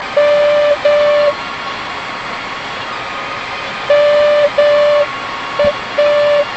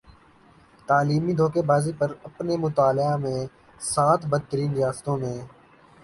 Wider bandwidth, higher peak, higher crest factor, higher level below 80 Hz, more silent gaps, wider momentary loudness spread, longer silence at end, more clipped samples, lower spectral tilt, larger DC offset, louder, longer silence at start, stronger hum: second, 8.2 kHz vs 11.5 kHz; first, 0 dBFS vs -8 dBFS; second, 12 dB vs 18 dB; first, -46 dBFS vs -56 dBFS; neither; about the same, 11 LU vs 12 LU; second, 0 s vs 0.55 s; neither; second, -3.5 dB/octave vs -6.5 dB/octave; neither; first, -14 LUFS vs -24 LUFS; second, 0 s vs 0.9 s; neither